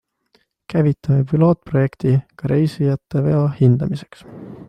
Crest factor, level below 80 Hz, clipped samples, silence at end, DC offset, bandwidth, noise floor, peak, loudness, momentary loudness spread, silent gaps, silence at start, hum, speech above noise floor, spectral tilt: 14 dB; -48 dBFS; under 0.1%; 0.05 s; under 0.1%; 9 kHz; -62 dBFS; -4 dBFS; -18 LUFS; 10 LU; none; 0.7 s; none; 44 dB; -10 dB/octave